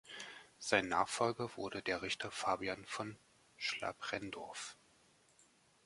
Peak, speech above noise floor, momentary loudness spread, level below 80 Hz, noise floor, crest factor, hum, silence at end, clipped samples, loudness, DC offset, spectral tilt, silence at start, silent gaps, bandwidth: -14 dBFS; 31 dB; 14 LU; -72 dBFS; -70 dBFS; 28 dB; none; 1.1 s; under 0.1%; -40 LUFS; under 0.1%; -3 dB/octave; 0.05 s; none; 11.5 kHz